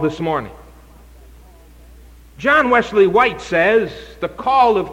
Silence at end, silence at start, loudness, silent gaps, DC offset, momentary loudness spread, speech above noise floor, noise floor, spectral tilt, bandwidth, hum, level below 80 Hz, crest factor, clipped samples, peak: 0 s; 0 s; -16 LUFS; none; under 0.1%; 14 LU; 27 dB; -43 dBFS; -5.5 dB/octave; 16 kHz; none; -44 dBFS; 16 dB; under 0.1%; -2 dBFS